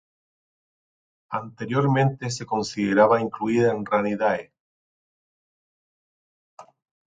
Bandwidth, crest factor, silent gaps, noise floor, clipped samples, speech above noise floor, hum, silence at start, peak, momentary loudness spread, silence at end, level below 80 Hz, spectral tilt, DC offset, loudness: 9.2 kHz; 22 dB; 4.60-6.57 s; under -90 dBFS; under 0.1%; over 68 dB; none; 1.3 s; -4 dBFS; 12 LU; 0.45 s; -64 dBFS; -6.5 dB/octave; under 0.1%; -23 LUFS